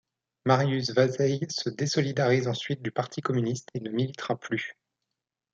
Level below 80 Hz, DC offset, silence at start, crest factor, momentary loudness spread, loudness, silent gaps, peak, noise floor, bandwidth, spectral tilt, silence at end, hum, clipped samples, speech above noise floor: -70 dBFS; under 0.1%; 0.45 s; 20 dB; 9 LU; -28 LUFS; none; -8 dBFS; -86 dBFS; 7.8 kHz; -5.5 dB/octave; 0.85 s; none; under 0.1%; 59 dB